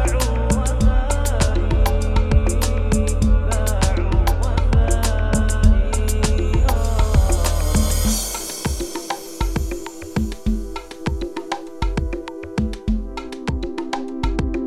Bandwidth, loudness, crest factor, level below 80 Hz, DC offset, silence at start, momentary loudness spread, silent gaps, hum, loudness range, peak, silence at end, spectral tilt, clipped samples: 15.5 kHz; -21 LUFS; 16 dB; -20 dBFS; under 0.1%; 0 s; 9 LU; none; none; 7 LU; -2 dBFS; 0 s; -5.5 dB/octave; under 0.1%